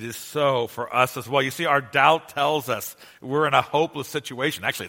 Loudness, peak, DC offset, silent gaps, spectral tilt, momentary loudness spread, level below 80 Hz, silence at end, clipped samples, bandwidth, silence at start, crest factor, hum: -23 LUFS; -2 dBFS; under 0.1%; none; -4 dB/octave; 11 LU; -66 dBFS; 0 s; under 0.1%; 17 kHz; 0 s; 22 dB; none